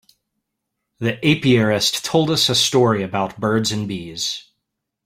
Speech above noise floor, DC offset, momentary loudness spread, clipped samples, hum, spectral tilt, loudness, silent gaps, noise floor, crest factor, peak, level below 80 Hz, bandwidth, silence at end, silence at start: 60 dB; under 0.1%; 10 LU; under 0.1%; none; -4 dB/octave; -18 LUFS; none; -78 dBFS; 18 dB; -2 dBFS; -54 dBFS; 16 kHz; 0.65 s; 1 s